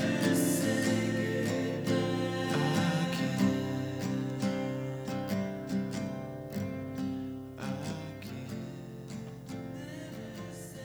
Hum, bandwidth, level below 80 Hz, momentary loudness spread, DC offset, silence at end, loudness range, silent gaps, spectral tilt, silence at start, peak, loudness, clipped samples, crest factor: none; over 20 kHz; -62 dBFS; 14 LU; under 0.1%; 0 s; 10 LU; none; -5.5 dB/octave; 0 s; -16 dBFS; -33 LUFS; under 0.1%; 18 dB